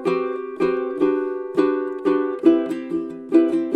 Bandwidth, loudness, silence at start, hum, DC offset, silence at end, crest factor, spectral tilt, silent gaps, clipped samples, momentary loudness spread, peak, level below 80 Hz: 8.4 kHz; -21 LUFS; 0 s; none; under 0.1%; 0 s; 18 dB; -7.5 dB/octave; none; under 0.1%; 8 LU; -2 dBFS; -64 dBFS